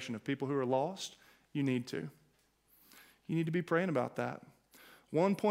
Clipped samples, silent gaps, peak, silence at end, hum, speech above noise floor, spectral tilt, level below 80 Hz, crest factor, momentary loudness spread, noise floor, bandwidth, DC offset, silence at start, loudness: under 0.1%; none; -18 dBFS; 0 s; none; 38 dB; -6.5 dB/octave; -78 dBFS; 18 dB; 12 LU; -72 dBFS; 16 kHz; under 0.1%; 0 s; -36 LUFS